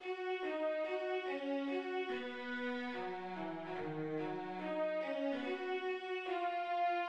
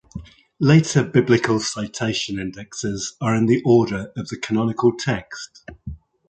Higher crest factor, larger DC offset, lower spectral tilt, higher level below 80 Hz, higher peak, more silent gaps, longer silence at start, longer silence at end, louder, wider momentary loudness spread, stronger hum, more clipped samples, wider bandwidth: second, 12 dB vs 18 dB; neither; about the same, -6.5 dB/octave vs -5.5 dB/octave; second, -80 dBFS vs -48 dBFS; second, -28 dBFS vs -2 dBFS; neither; second, 0 s vs 0.15 s; second, 0 s vs 0.35 s; second, -40 LUFS vs -20 LUFS; second, 5 LU vs 21 LU; neither; neither; about the same, 8.6 kHz vs 9.2 kHz